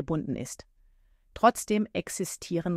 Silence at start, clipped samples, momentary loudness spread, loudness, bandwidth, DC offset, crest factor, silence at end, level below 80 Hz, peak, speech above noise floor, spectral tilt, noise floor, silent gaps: 0 s; under 0.1%; 16 LU; -29 LUFS; 16 kHz; under 0.1%; 22 dB; 0 s; -56 dBFS; -8 dBFS; 34 dB; -5 dB/octave; -62 dBFS; none